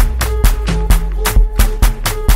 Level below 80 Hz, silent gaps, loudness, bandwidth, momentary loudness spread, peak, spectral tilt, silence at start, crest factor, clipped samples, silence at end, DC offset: -12 dBFS; none; -16 LUFS; 16.5 kHz; 2 LU; 0 dBFS; -4.5 dB/octave; 0 s; 10 dB; under 0.1%; 0 s; under 0.1%